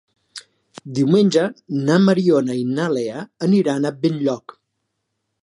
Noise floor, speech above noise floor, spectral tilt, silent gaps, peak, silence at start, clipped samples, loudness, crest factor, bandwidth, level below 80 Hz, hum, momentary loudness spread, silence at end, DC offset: -75 dBFS; 57 dB; -7 dB/octave; none; -2 dBFS; 0.35 s; under 0.1%; -19 LUFS; 18 dB; 11 kHz; -68 dBFS; none; 15 LU; 1.05 s; under 0.1%